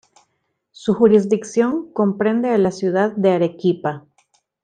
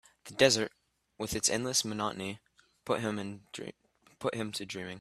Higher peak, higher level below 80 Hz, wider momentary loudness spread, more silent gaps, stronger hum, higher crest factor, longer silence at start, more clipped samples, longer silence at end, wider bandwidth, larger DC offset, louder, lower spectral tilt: first, -2 dBFS vs -8 dBFS; about the same, -60 dBFS vs -64 dBFS; second, 10 LU vs 18 LU; neither; neither; second, 16 dB vs 26 dB; first, 0.8 s vs 0.25 s; neither; first, 0.65 s vs 0 s; second, 9.4 kHz vs 14.5 kHz; neither; first, -18 LUFS vs -32 LUFS; first, -7 dB/octave vs -2.5 dB/octave